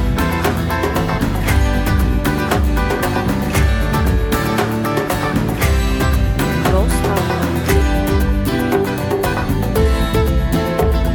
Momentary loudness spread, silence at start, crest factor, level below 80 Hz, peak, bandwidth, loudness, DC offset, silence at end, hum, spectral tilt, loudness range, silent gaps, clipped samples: 2 LU; 0 s; 14 dB; -20 dBFS; -2 dBFS; 19.5 kHz; -17 LUFS; under 0.1%; 0 s; none; -6 dB/octave; 1 LU; none; under 0.1%